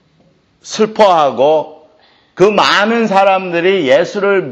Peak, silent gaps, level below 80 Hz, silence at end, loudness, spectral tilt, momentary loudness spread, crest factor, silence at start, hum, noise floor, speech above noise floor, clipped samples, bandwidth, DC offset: 0 dBFS; none; -56 dBFS; 0 s; -11 LUFS; -4.5 dB/octave; 7 LU; 12 dB; 0.65 s; none; -53 dBFS; 42 dB; under 0.1%; 8.8 kHz; under 0.1%